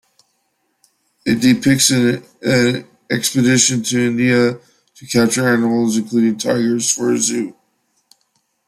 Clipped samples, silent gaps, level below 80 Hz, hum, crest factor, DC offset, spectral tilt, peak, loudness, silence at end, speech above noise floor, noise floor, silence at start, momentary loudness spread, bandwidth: under 0.1%; none; -56 dBFS; none; 16 dB; under 0.1%; -4 dB/octave; 0 dBFS; -15 LUFS; 1.15 s; 51 dB; -67 dBFS; 1.25 s; 9 LU; 14.5 kHz